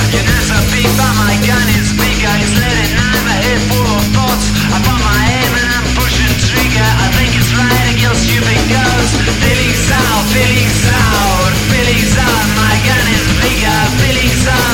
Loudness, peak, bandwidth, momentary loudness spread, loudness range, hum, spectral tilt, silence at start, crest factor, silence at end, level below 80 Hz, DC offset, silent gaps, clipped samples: -11 LUFS; 0 dBFS; 17 kHz; 2 LU; 1 LU; none; -4 dB/octave; 0 s; 10 dB; 0 s; -20 dBFS; 0.5%; none; under 0.1%